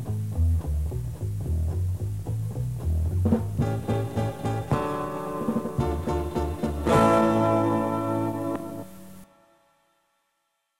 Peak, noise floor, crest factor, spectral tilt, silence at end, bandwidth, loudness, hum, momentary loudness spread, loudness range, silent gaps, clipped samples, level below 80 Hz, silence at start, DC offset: -6 dBFS; -76 dBFS; 20 dB; -7.5 dB/octave; 0 s; 16 kHz; -26 LUFS; none; 10 LU; 4 LU; none; under 0.1%; -36 dBFS; 0 s; 0.4%